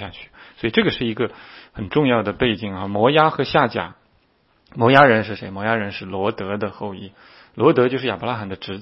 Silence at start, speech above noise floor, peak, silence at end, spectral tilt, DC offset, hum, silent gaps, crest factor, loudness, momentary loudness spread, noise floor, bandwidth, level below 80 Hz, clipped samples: 0 s; 41 dB; 0 dBFS; 0 s; -8.5 dB/octave; under 0.1%; none; none; 20 dB; -19 LUFS; 17 LU; -61 dBFS; 6 kHz; -52 dBFS; under 0.1%